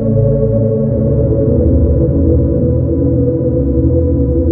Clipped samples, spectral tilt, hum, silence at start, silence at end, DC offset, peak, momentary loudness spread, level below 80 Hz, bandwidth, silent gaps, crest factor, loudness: under 0.1%; -16 dB/octave; none; 0 s; 0 s; under 0.1%; 0 dBFS; 2 LU; -18 dBFS; 1.8 kHz; none; 10 dB; -13 LUFS